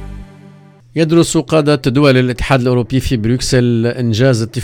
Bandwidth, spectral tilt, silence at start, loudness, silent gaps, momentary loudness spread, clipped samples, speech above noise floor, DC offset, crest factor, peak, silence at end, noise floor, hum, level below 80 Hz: 15.5 kHz; -6 dB/octave; 0 s; -13 LUFS; none; 5 LU; under 0.1%; 28 dB; under 0.1%; 14 dB; 0 dBFS; 0 s; -41 dBFS; none; -32 dBFS